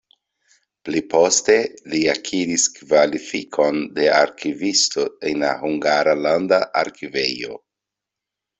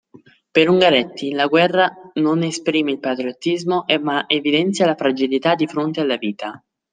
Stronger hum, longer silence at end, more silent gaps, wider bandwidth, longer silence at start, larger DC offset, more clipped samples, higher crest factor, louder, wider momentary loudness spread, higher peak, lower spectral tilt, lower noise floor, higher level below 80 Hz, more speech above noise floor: neither; first, 1 s vs 0.35 s; neither; second, 8.4 kHz vs 9.6 kHz; first, 0.85 s vs 0.55 s; neither; neither; about the same, 20 dB vs 18 dB; about the same, -19 LUFS vs -18 LUFS; about the same, 9 LU vs 8 LU; about the same, 0 dBFS vs 0 dBFS; second, -2.5 dB/octave vs -5 dB/octave; first, -85 dBFS vs -49 dBFS; about the same, -62 dBFS vs -66 dBFS; first, 66 dB vs 31 dB